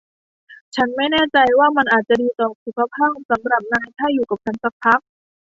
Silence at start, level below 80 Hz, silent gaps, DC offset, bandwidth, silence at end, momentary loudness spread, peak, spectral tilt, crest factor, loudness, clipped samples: 0.5 s; -56 dBFS; 0.61-0.72 s, 2.55-2.66 s, 3.25-3.29 s, 4.72-4.80 s; under 0.1%; 7.8 kHz; 0.6 s; 9 LU; -2 dBFS; -5 dB/octave; 18 dB; -18 LUFS; under 0.1%